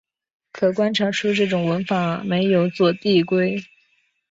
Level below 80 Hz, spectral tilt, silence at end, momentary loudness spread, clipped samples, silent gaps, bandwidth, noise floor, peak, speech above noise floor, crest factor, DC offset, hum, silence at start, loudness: -62 dBFS; -6.5 dB/octave; 0.7 s; 4 LU; under 0.1%; none; 7.8 kHz; -64 dBFS; -4 dBFS; 45 dB; 16 dB; under 0.1%; none; 0.55 s; -20 LUFS